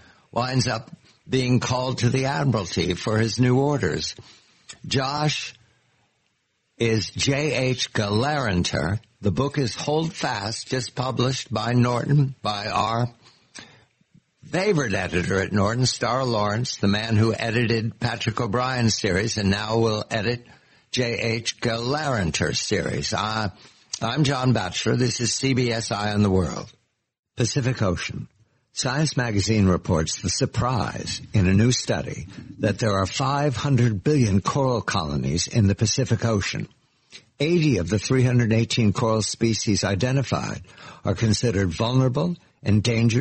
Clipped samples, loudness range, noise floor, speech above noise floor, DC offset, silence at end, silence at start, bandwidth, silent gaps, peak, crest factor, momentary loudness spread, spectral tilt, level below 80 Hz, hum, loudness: under 0.1%; 3 LU; -71 dBFS; 49 dB; under 0.1%; 0 s; 0.35 s; 8.8 kHz; 27.19-27.23 s; -8 dBFS; 14 dB; 8 LU; -5 dB/octave; -48 dBFS; none; -23 LUFS